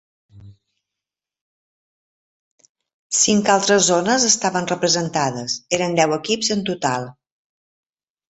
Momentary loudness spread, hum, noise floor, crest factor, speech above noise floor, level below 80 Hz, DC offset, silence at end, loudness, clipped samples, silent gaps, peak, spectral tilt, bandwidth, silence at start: 7 LU; 50 Hz at -55 dBFS; -87 dBFS; 20 dB; 68 dB; -60 dBFS; under 0.1%; 1.2 s; -18 LUFS; under 0.1%; 1.41-2.58 s, 2.69-2.75 s, 2.93-3.10 s; -2 dBFS; -2.5 dB/octave; 8.6 kHz; 0.35 s